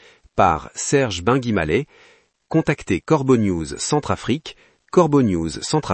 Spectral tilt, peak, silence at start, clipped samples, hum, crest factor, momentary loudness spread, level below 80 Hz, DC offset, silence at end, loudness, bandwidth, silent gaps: -5.5 dB/octave; -2 dBFS; 0.35 s; under 0.1%; none; 18 dB; 7 LU; -46 dBFS; under 0.1%; 0 s; -20 LUFS; 8.8 kHz; none